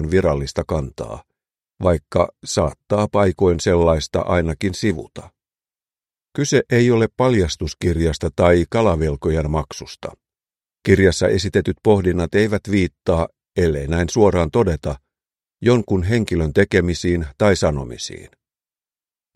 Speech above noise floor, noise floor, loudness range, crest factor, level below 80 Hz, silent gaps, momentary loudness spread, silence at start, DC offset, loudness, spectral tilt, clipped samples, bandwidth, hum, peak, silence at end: over 72 dB; under -90 dBFS; 3 LU; 18 dB; -34 dBFS; none; 13 LU; 0 s; under 0.1%; -19 LUFS; -6 dB/octave; under 0.1%; 12.5 kHz; none; 0 dBFS; 1.1 s